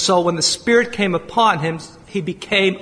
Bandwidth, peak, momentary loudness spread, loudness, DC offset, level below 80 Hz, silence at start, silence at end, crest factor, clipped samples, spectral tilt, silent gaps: 10.5 kHz; -2 dBFS; 10 LU; -18 LUFS; under 0.1%; -52 dBFS; 0 s; 0 s; 16 dB; under 0.1%; -3.5 dB/octave; none